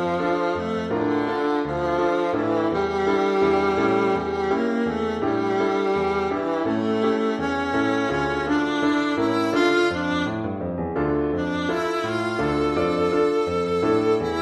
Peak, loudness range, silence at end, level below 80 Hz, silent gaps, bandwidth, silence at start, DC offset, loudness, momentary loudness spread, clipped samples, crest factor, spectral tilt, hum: -8 dBFS; 1 LU; 0 s; -48 dBFS; none; 12 kHz; 0 s; under 0.1%; -23 LUFS; 4 LU; under 0.1%; 14 dB; -6 dB/octave; none